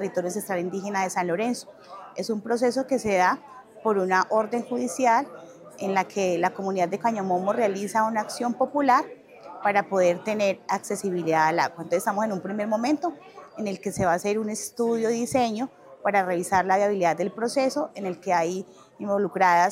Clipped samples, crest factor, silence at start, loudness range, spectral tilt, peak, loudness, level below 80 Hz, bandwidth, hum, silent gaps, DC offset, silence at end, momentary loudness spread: under 0.1%; 18 dB; 0 s; 2 LU; -4.5 dB/octave; -6 dBFS; -25 LUFS; -66 dBFS; 16 kHz; none; none; under 0.1%; 0 s; 11 LU